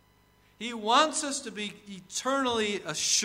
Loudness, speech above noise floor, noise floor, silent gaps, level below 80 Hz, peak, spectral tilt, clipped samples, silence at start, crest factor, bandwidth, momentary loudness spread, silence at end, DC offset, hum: -28 LUFS; 34 dB; -63 dBFS; none; -68 dBFS; -8 dBFS; -1.5 dB/octave; under 0.1%; 0.6 s; 22 dB; 16 kHz; 14 LU; 0 s; under 0.1%; none